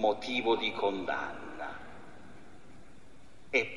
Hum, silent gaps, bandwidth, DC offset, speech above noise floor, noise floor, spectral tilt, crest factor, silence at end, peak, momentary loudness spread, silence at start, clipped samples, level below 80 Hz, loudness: none; none; 11.5 kHz; 0.5%; 26 dB; -58 dBFS; -4 dB/octave; 20 dB; 0 s; -14 dBFS; 23 LU; 0 s; under 0.1%; -64 dBFS; -33 LUFS